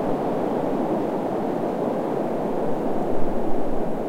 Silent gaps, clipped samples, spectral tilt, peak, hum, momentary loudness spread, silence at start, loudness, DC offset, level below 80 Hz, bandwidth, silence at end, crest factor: none; under 0.1%; -8 dB/octave; -6 dBFS; none; 2 LU; 0 s; -25 LUFS; 0.9%; -38 dBFS; 9.2 kHz; 0 s; 14 dB